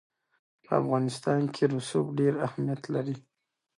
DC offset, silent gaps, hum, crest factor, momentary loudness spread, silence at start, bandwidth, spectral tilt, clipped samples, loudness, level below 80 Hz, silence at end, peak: under 0.1%; none; none; 18 dB; 6 LU; 0.7 s; 11.5 kHz; -7 dB/octave; under 0.1%; -29 LUFS; -72 dBFS; 0.6 s; -10 dBFS